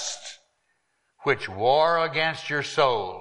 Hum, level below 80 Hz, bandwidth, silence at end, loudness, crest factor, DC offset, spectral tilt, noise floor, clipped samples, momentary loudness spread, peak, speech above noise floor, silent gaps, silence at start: none; -64 dBFS; 11.5 kHz; 0 s; -24 LUFS; 20 dB; under 0.1%; -3 dB/octave; -72 dBFS; under 0.1%; 11 LU; -6 dBFS; 49 dB; none; 0 s